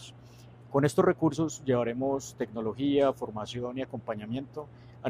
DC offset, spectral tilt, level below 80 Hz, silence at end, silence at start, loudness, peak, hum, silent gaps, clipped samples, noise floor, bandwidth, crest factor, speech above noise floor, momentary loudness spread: under 0.1%; -6.5 dB/octave; -62 dBFS; 0 s; 0 s; -30 LUFS; -10 dBFS; none; none; under 0.1%; -51 dBFS; 15.5 kHz; 20 dB; 22 dB; 12 LU